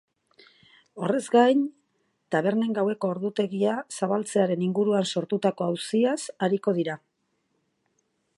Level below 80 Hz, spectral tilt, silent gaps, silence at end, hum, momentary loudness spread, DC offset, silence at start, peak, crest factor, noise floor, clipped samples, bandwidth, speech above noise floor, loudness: -78 dBFS; -5.5 dB/octave; none; 1.4 s; none; 7 LU; under 0.1%; 0.95 s; -6 dBFS; 20 dB; -74 dBFS; under 0.1%; 11.5 kHz; 49 dB; -25 LUFS